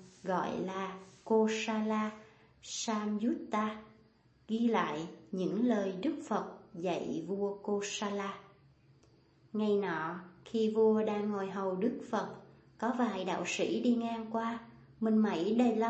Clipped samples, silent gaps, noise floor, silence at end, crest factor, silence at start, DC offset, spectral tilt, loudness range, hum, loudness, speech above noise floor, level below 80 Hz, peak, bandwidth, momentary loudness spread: under 0.1%; none; -65 dBFS; 0 s; 18 dB; 0 s; under 0.1%; -5.5 dB/octave; 4 LU; none; -34 LUFS; 32 dB; -74 dBFS; -16 dBFS; 8.4 kHz; 12 LU